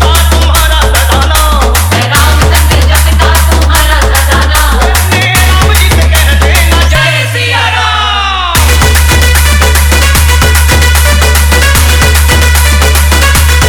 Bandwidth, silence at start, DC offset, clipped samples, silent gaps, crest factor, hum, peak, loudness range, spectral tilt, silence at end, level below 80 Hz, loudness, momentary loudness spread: over 20 kHz; 0 s; under 0.1%; 1%; none; 6 dB; none; 0 dBFS; 1 LU; -3.5 dB/octave; 0 s; -8 dBFS; -6 LUFS; 2 LU